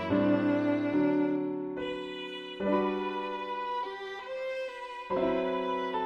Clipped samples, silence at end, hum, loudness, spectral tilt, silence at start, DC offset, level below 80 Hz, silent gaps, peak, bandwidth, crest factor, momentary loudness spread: under 0.1%; 0 s; none; -31 LUFS; -7.5 dB/octave; 0 s; under 0.1%; -64 dBFS; none; -16 dBFS; 7.2 kHz; 16 dB; 11 LU